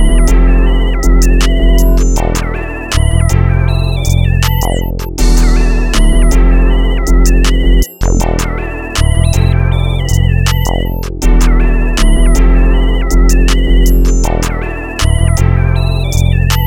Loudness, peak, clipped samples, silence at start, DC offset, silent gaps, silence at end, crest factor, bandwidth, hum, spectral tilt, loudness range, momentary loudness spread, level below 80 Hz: -12 LUFS; 0 dBFS; under 0.1%; 0 s; under 0.1%; none; 0 s; 8 dB; 16 kHz; none; -5.5 dB/octave; 1 LU; 5 LU; -10 dBFS